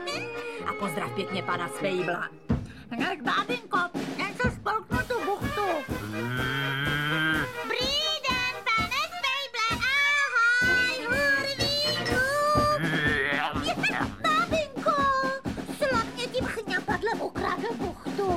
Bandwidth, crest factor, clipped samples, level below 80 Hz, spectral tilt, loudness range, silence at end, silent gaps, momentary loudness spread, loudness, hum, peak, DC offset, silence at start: 16 kHz; 16 dB; under 0.1%; -48 dBFS; -4 dB/octave; 6 LU; 0 s; none; 9 LU; -27 LUFS; none; -12 dBFS; 0.2%; 0 s